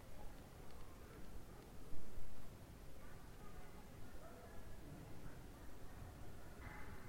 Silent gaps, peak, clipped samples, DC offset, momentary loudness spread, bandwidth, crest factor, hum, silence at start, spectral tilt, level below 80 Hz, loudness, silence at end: none; -30 dBFS; under 0.1%; under 0.1%; 3 LU; 16 kHz; 16 dB; none; 0 s; -5.5 dB/octave; -58 dBFS; -59 LUFS; 0 s